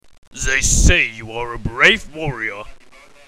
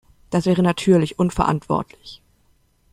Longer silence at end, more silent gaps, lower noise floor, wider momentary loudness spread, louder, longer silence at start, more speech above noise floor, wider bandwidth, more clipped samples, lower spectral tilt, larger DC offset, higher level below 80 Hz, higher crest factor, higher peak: second, 0.45 s vs 0.75 s; neither; second, -45 dBFS vs -60 dBFS; second, 14 LU vs 18 LU; first, -16 LUFS vs -20 LUFS; about the same, 0.35 s vs 0.3 s; second, 28 dB vs 41 dB; first, 16 kHz vs 12 kHz; neither; second, -2.5 dB/octave vs -7 dB/octave; first, 0.4% vs under 0.1%; first, -24 dBFS vs -42 dBFS; about the same, 18 dB vs 18 dB; about the same, 0 dBFS vs -2 dBFS